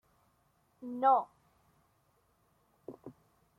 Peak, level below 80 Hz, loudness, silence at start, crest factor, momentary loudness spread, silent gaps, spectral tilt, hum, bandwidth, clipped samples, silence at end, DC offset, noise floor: -14 dBFS; -80 dBFS; -30 LUFS; 0.8 s; 24 dB; 25 LU; none; -7 dB/octave; none; 4.1 kHz; under 0.1%; 0.45 s; under 0.1%; -73 dBFS